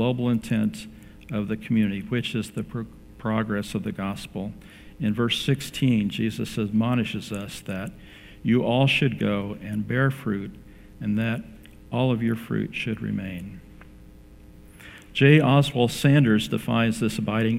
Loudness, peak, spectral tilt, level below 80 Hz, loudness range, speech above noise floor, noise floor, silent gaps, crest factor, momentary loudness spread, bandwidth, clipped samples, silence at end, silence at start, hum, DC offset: -25 LUFS; -4 dBFS; -6.5 dB/octave; -50 dBFS; 7 LU; 23 dB; -47 dBFS; none; 22 dB; 15 LU; 15.5 kHz; under 0.1%; 0 s; 0 s; none; under 0.1%